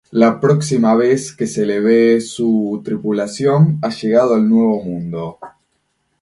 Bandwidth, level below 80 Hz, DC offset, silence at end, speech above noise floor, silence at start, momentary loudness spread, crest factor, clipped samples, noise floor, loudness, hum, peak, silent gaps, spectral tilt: 11.5 kHz; -56 dBFS; under 0.1%; 0.7 s; 52 dB; 0.1 s; 9 LU; 14 dB; under 0.1%; -66 dBFS; -15 LUFS; none; 0 dBFS; none; -7 dB/octave